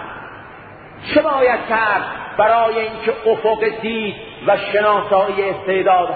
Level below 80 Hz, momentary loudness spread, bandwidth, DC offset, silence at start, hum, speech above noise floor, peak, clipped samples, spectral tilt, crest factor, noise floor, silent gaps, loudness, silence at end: -52 dBFS; 17 LU; 4.8 kHz; under 0.1%; 0 s; none; 21 dB; 0 dBFS; under 0.1%; -10 dB/octave; 16 dB; -38 dBFS; none; -17 LUFS; 0 s